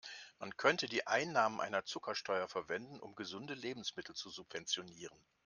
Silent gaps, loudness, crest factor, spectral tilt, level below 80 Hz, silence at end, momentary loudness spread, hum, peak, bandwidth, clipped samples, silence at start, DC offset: none; -39 LUFS; 26 dB; -2.5 dB/octave; -80 dBFS; 0.35 s; 15 LU; none; -14 dBFS; 10.5 kHz; under 0.1%; 0.05 s; under 0.1%